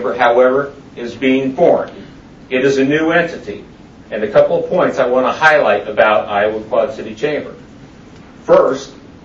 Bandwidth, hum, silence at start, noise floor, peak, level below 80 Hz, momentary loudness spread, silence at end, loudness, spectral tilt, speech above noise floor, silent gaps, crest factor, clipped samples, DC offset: 7.8 kHz; none; 0 s; -38 dBFS; 0 dBFS; -50 dBFS; 17 LU; 0.15 s; -14 LUFS; -5.5 dB/octave; 25 dB; none; 14 dB; under 0.1%; under 0.1%